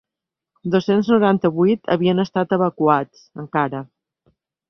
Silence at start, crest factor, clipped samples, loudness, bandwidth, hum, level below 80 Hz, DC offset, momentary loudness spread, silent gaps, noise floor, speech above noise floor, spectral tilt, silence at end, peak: 0.65 s; 18 dB; under 0.1%; -19 LUFS; 6.2 kHz; none; -60 dBFS; under 0.1%; 13 LU; none; -86 dBFS; 68 dB; -8 dB/octave; 0.85 s; -2 dBFS